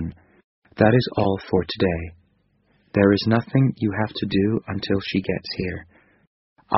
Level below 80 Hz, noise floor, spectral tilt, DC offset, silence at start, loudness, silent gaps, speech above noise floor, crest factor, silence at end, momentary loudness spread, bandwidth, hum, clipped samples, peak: -48 dBFS; -64 dBFS; -5.5 dB/octave; under 0.1%; 0 s; -22 LUFS; 0.44-0.62 s, 6.27-6.56 s; 43 dB; 20 dB; 0 s; 11 LU; 6 kHz; none; under 0.1%; -2 dBFS